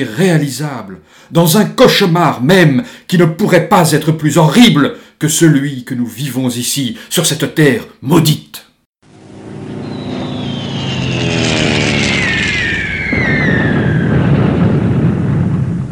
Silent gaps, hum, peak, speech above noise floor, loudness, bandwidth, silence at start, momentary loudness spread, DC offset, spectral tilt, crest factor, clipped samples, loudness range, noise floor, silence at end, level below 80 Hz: 8.86-8.93 s; none; 0 dBFS; 25 dB; -12 LUFS; 19 kHz; 0 s; 12 LU; under 0.1%; -5 dB/octave; 12 dB; 0.3%; 6 LU; -37 dBFS; 0 s; -36 dBFS